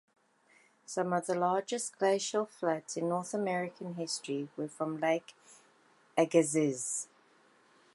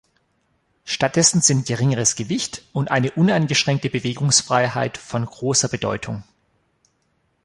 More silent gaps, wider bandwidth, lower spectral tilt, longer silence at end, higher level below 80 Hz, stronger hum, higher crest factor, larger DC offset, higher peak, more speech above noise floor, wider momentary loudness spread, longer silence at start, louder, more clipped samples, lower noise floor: neither; about the same, 11.5 kHz vs 11.5 kHz; about the same, -4 dB/octave vs -3.5 dB/octave; second, 0.9 s vs 1.2 s; second, -86 dBFS vs -54 dBFS; neither; about the same, 22 dB vs 20 dB; neither; second, -12 dBFS vs -2 dBFS; second, 34 dB vs 47 dB; about the same, 10 LU vs 11 LU; about the same, 0.9 s vs 0.85 s; second, -33 LUFS vs -19 LUFS; neither; about the same, -67 dBFS vs -67 dBFS